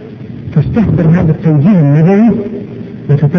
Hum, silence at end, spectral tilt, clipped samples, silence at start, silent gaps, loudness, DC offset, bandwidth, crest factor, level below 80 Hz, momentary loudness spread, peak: none; 0 s; -11 dB/octave; under 0.1%; 0 s; none; -9 LUFS; under 0.1%; 5.8 kHz; 10 dB; -32 dBFS; 16 LU; 0 dBFS